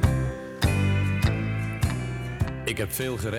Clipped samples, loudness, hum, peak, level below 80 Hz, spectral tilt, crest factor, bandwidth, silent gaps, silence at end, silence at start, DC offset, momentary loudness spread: under 0.1%; -27 LUFS; none; -8 dBFS; -36 dBFS; -5.5 dB/octave; 16 dB; 17 kHz; none; 0 s; 0 s; under 0.1%; 6 LU